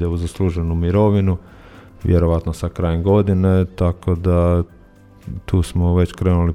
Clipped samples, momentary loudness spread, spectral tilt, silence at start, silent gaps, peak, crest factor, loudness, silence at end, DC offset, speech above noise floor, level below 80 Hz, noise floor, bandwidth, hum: under 0.1%; 8 LU; -8.5 dB/octave; 0 s; none; -4 dBFS; 14 dB; -18 LUFS; 0 s; under 0.1%; 29 dB; -30 dBFS; -45 dBFS; 11 kHz; none